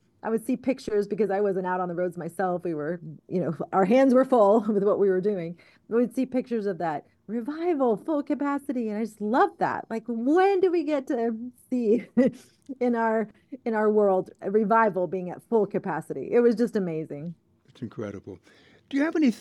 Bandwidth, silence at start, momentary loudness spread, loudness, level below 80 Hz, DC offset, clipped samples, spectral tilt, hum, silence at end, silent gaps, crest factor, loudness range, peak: 12.5 kHz; 0.25 s; 13 LU; -25 LUFS; -72 dBFS; under 0.1%; under 0.1%; -7.5 dB/octave; none; 0 s; none; 16 dB; 5 LU; -10 dBFS